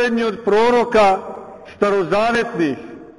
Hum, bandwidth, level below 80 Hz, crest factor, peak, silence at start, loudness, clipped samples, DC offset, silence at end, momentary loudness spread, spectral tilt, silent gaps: none; 11.5 kHz; -48 dBFS; 12 dB; -4 dBFS; 0 s; -17 LUFS; under 0.1%; under 0.1%; 0.1 s; 17 LU; -5.5 dB/octave; none